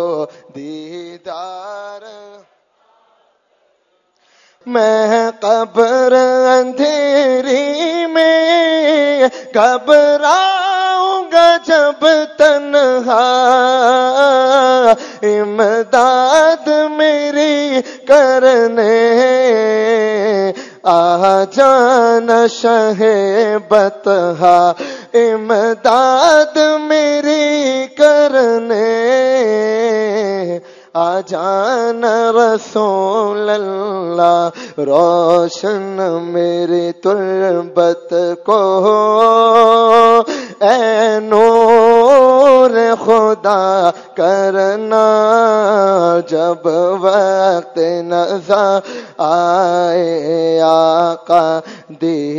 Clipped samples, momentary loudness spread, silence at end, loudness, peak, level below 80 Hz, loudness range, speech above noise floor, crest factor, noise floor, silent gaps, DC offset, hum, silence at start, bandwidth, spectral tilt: 0.5%; 8 LU; 0 s; -12 LUFS; 0 dBFS; -62 dBFS; 5 LU; 49 dB; 12 dB; -60 dBFS; none; under 0.1%; none; 0 s; 9.6 kHz; -4 dB/octave